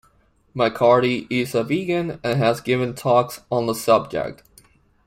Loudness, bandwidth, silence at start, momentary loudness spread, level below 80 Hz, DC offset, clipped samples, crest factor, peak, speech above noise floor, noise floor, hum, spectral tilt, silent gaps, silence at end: -20 LUFS; 16 kHz; 0.55 s; 8 LU; -56 dBFS; under 0.1%; under 0.1%; 18 dB; -2 dBFS; 39 dB; -59 dBFS; none; -6 dB/octave; none; 0.75 s